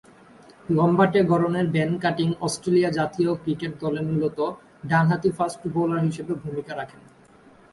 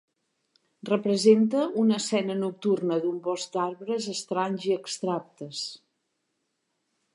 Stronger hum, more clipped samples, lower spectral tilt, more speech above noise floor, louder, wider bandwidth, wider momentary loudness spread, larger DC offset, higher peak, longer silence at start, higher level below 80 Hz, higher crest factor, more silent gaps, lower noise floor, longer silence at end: neither; neither; first, -7 dB/octave vs -5 dB/octave; second, 30 dB vs 52 dB; first, -23 LUFS vs -27 LUFS; about the same, 11.5 kHz vs 11.5 kHz; about the same, 12 LU vs 13 LU; neither; about the same, -6 dBFS vs -8 dBFS; second, 0.7 s vs 0.85 s; first, -58 dBFS vs -82 dBFS; about the same, 18 dB vs 20 dB; neither; second, -52 dBFS vs -78 dBFS; second, 0.85 s vs 1.4 s